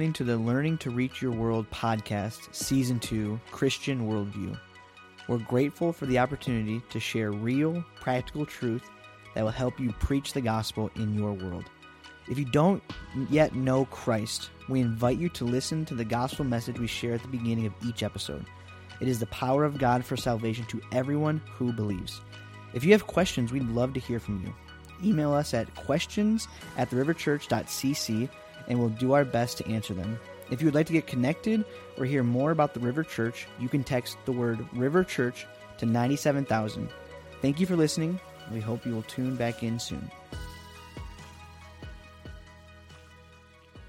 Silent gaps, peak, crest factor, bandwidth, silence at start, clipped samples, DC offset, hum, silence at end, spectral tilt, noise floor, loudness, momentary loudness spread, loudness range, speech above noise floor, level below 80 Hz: none; -6 dBFS; 24 dB; 16 kHz; 0 s; under 0.1%; under 0.1%; none; 0 s; -6 dB/octave; -55 dBFS; -29 LUFS; 16 LU; 4 LU; 26 dB; -52 dBFS